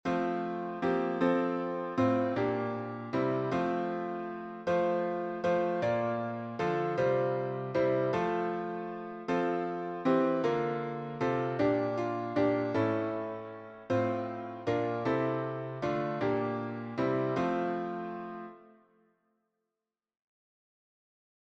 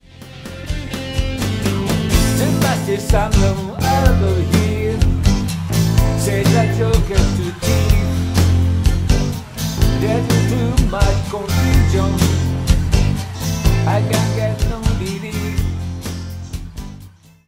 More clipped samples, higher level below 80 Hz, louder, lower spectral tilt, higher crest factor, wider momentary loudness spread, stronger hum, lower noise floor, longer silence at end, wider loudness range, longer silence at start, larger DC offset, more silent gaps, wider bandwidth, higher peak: neither; second, -68 dBFS vs -22 dBFS; second, -32 LUFS vs -17 LUFS; first, -8 dB/octave vs -6 dB/octave; about the same, 18 dB vs 16 dB; about the same, 9 LU vs 10 LU; neither; first, under -90 dBFS vs -41 dBFS; first, 2.9 s vs 0.4 s; about the same, 4 LU vs 3 LU; second, 0.05 s vs 0.2 s; second, under 0.1% vs 0.2%; neither; second, 8 kHz vs 16.5 kHz; second, -14 dBFS vs 0 dBFS